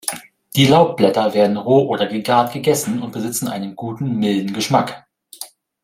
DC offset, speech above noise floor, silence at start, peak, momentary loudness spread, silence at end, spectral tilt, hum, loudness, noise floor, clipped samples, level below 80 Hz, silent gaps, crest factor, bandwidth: under 0.1%; 21 dB; 0.05 s; 0 dBFS; 14 LU; 0.4 s; -5 dB/octave; none; -17 LUFS; -38 dBFS; under 0.1%; -58 dBFS; none; 16 dB; 16.5 kHz